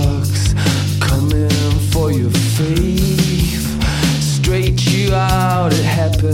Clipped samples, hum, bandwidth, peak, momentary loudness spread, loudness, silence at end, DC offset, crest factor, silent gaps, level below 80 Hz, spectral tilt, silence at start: under 0.1%; none; 16.5 kHz; -2 dBFS; 2 LU; -15 LUFS; 0 s; under 0.1%; 12 dB; none; -24 dBFS; -5.5 dB/octave; 0 s